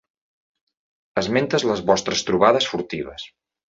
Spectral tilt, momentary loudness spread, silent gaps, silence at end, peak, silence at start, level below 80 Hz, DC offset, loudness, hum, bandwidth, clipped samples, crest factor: -4 dB/octave; 15 LU; none; 0.4 s; -2 dBFS; 1.15 s; -54 dBFS; under 0.1%; -21 LUFS; none; 8 kHz; under 0.1%; 22 dB